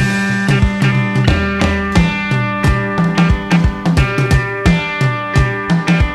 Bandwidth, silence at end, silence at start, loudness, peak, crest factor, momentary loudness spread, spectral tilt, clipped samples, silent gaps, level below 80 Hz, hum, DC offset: 12.5 kHz; 0 s; 0 s; -14 LUFS; 0 dBFS; 14 dB; 2 LU; -6.5 dB/octave; under 0.1%; none; -22 dBFS; none; under 0.1%